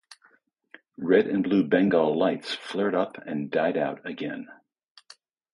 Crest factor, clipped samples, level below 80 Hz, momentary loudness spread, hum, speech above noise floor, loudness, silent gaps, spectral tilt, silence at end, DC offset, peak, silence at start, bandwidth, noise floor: 20 dB; under 0.1%; -68 dBFS; 13 LU; none; 38 dB; -25 LUFS; none; -7 dB/octave; 1 s; under 0.1%; -6 dBFS; 1 s; 11 kHz; -63 dBFS